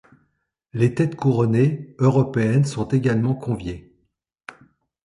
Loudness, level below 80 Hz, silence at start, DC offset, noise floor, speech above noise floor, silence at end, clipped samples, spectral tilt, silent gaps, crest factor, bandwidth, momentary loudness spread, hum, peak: -21 LUFS; -50 dBFS; 0.75 s; under 0.1%; -72 dBFS; 52 dB; 1.25 s; under 0.1%; -8 dB/octave; none; 18 dB; 11 kHz; 21 LU; none; -4 dBFS